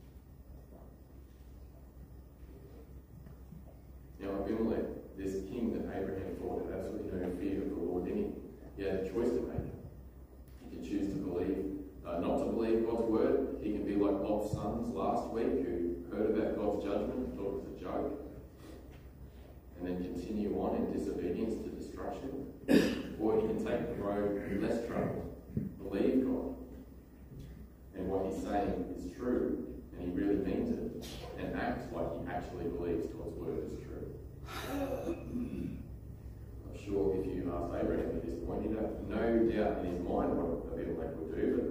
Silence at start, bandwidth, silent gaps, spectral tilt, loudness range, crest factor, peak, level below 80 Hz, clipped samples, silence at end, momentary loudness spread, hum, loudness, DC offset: 0 s; 15.5 kHz; none; -7.5 dB/octave; 7 LU; 24 dB; -14 dBFS; -50 dBFS; under 0.1%; 0 s; 21 LU; none; -36 LUFS; under 0.1%